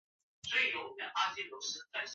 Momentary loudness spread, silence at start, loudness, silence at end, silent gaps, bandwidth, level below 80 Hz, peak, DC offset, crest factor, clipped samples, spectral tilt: 9 LU; 0.45 s; -35 LUFS; 0 s; none; 7.6 kHz; -78 dBFS; -20 dBFS; under 0.1%; 20 dB; under 0.1%; 2.5 dB/octave